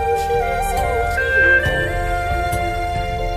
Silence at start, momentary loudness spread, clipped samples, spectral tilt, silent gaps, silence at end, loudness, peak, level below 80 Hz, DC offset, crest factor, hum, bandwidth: 0 s; 9 LU; under 0.1%; -4.5 dB/octave; none; 0 s; -18 LUFS; -4 dBFS; -26 dBFS; under 0.1%; 14 dB; none; 15.5 kHz